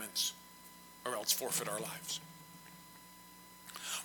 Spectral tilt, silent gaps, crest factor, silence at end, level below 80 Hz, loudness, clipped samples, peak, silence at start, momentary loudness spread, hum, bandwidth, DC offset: -1 dB/octave; none; 24 dB; 0 s; -78 dBFS; -37 LUFS; under 0.1%; -18 dBFS; 0 s; 21 LU; none; 17.5 kHz; under 0.1%